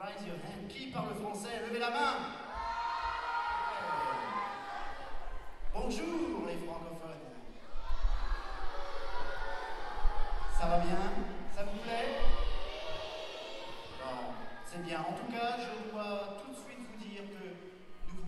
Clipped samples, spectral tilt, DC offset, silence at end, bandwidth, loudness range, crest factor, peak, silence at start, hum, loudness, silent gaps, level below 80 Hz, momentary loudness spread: under 0.1%; -5 dB/octave; under 0.1%; 0 s; 11.5 kHz; 5 LU; 18 dB; -14 dBFS; 0 s; none; -39 LUFS; none; -40 dBFS; 12 LU